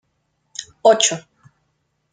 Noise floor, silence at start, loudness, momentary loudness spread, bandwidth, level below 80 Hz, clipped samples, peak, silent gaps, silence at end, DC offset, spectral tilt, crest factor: -69 dBFS; 0.6 s; -16 LUFS; 20 LU; 9.8 kHz; -68 dBFS; under 0.1%; -2 dBFS; none; 0.95 s; under 0.1%; -1.5 dB/octave; 20 dB